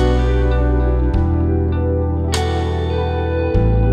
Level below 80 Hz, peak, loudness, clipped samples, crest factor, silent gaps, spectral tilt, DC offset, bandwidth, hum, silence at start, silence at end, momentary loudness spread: -18 dBFS; -4 dBFS; -18 LUFS; under 0.1%; 12 dB; none; -7 dB/octave; under 0.1%; 11 kHz; none; 0 s; 0 s; 3 LU